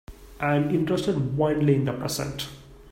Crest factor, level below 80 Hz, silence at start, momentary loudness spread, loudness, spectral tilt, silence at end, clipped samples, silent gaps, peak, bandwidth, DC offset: 16 dB; -50 dBFS; 0.1 s; 9 LU; -25 LUFS; -6 dB/octave; 0 s; under 0.1%; none; -8 dBFS; 16 kHz; under 0.1%